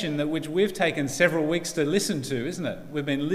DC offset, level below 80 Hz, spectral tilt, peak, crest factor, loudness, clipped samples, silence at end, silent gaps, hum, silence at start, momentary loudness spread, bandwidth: under 0.1%; -54 dBFS; -4.5 dB/octave; -6 dBFS; 20 dB; -26 LUFS; under 0.1%; 0 s; none; none; 0 s; 8 LU; 16 kHz